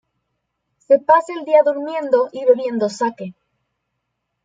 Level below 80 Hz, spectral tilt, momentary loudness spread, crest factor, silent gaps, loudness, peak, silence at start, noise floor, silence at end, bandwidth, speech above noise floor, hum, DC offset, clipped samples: -72 dBFS; -5.5 dB/octave; 10 LU; 18 dB; none; -17 LUFS; 0 dBFS; 0.9 s; -75 dBFS; 1.15 s; 9.2 kHz; 59 dB; none; under 0.1%; under 0.1%